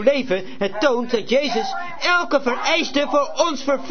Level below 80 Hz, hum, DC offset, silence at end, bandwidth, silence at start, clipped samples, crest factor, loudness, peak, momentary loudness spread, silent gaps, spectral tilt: -54 dBFS; none; 3%; 0 s; 6.6 kHz; 0 s; under 0.1%; 16 dB; -20 LUFS; -4 dBFS; 5 LU; none; -3 dB/octave